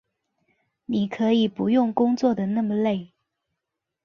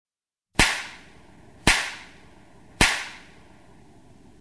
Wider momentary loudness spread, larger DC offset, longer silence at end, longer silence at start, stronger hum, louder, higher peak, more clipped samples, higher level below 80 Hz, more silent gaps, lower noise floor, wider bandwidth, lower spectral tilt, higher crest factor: second, 7 LU vs 18 LU; second, under 0.1% vs 0.2%; second, 1 s vs 1.2 s; first, 0.9 s vs 0.6 s; neither; about the same, -23 LUFS vs -22 LUFS; second, -8 dBFS vs -2 dBFS; neither; second, -66 dBFS vs -38 dBFS; neither; first, -84 dBFS vs -68 dBFS; second, 6.8 kHz vs 11 kHz; first, -7.5 dB/octave vs -2 dB/octave; second, 16 dB vs 28 dB